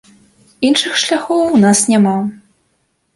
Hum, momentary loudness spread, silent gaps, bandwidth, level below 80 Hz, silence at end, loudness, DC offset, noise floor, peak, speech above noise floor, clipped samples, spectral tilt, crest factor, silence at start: none; 8 LU; none; 11.5 kHz; -56 dBFS; 0.8 s; -13 LUFS; under 0.1%; -63 dBFS; 0 dBFS; 51 dB; under 0.1%; -4 dB/octave; 14 dB; 0.6 s